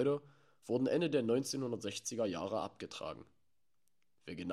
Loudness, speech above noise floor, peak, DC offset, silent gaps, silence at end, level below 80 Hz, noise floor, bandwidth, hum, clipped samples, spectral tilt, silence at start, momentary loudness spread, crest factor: -37 LUFS; 50 dB; -20 dBFS; under 0.1%; none; 0 s; -76 dBFS; -86 dBFS; 14 kHz; none; under 0.1%; -5 dB/octave; 0 s; 16 LU; 18 dB